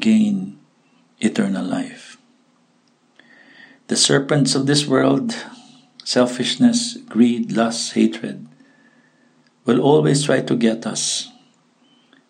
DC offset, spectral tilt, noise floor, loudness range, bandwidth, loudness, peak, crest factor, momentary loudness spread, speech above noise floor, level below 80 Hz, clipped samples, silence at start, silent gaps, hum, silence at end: under 0.1%; -4.5 dB/octave; -59 dBFS; 5 LU; 10.5 kHz; -18 LUFS; -2 dBFS; 18 dB; 16 LU; 42 dB; -70 dBFS; under 0.1%; 0 s; none; none; 1 s